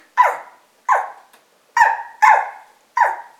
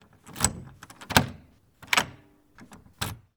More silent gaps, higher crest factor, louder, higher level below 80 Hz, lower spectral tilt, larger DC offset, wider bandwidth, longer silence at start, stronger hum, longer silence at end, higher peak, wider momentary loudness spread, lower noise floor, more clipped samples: neither; second, 18 dB vs 30 dB; first, -17 LUFS vs -27 LUFS; second, -72 dBFS vs -48 dBFS; second, 0.5 dB/octave vs -2.5 dB/octave; neither; second, 14.5 kHz vs over 20 kHz; about the same, 0.15 s vs 0.25 s; neither; about the same, 0.15 s vs 0.2 s; about the same, 0 dBFS vs 0 dBFS; second, 17 LU vs 22 LU; about the same, -54 dBFS vs -54 dBFS; neither